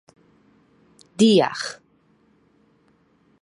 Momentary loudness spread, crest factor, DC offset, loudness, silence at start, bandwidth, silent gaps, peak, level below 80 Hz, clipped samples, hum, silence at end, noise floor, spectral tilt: 26 LU; 20 dB; under 0.1%; -19 LUFS; 1.2 s; 11.5 kHz; none; -4 dBFS; -70 dBFS; under 0.1%; none; 1.7 s; -61 dBFS; -5 dB/octave